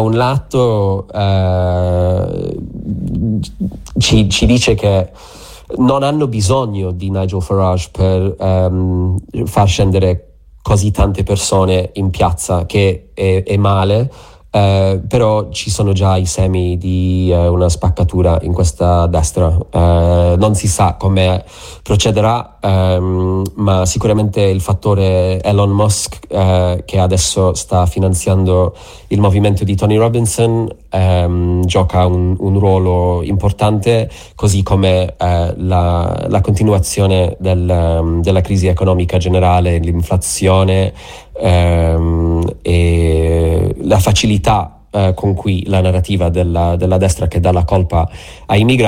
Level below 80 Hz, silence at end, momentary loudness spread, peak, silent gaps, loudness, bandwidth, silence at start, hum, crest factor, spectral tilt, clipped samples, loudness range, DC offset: -26 dBFS; 0 s; 6 LU; 0 dBFS; none; -13 LUFS; 15.5 kHz; 0 s; none; 12 dB; -6 dB/octave; under 0.1%; 2 LU; under 0.1%